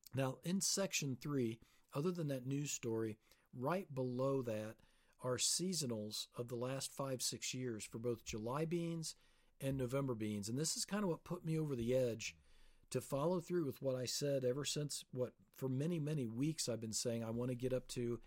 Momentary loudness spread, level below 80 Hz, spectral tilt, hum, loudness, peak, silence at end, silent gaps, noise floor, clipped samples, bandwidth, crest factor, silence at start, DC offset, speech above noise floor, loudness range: 8 LU; -68 dBFS; -4.5 dB/octave; none; -41 LUFS; -24 dBFS; 0 s; none; -65 dBFS; under 0.1%; 16.5 kHz; 18 dB; 0.15 s; under 0.1%; 23 dB; 2 LU